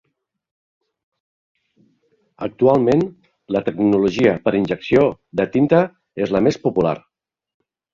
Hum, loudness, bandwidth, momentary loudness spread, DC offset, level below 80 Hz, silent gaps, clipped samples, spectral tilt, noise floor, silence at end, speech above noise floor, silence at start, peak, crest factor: none; -18 LUFS; 7.4 kHz; 10 LU; under 0.1%; -52 dBFS; none; under 0.1%; -7.5 dB/octave; -63 dBFS; 0.95 s; 46 dB; 2.4 s; -2 dBFS; 18 dB